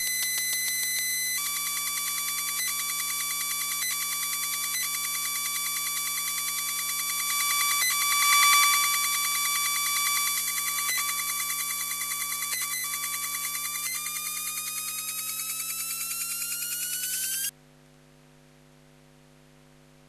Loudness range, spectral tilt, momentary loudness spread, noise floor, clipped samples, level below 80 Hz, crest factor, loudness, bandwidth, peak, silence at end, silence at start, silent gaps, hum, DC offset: 8 LU; 2.5 dB/octave; 7 LU; -56 dBFS; under 0.1%; -68 dBFS; 22 dB; -25 LUFS; 14 kHz; -6 dBFS; 2.6 s; 0 s; none; none; under 0.1%